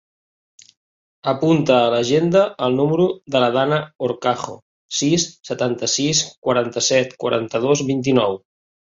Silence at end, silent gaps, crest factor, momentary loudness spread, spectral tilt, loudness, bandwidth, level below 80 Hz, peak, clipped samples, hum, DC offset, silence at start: 0.65 s; 4.62-4.89 s, 6.38-6.42 s; 16 dB; 8 LU; -4 dB/octave; -19 LUFS; 8 kHz; -60 dBFS; -2 dBFS; under 0.1%; none; under 0.1%; 1.25 s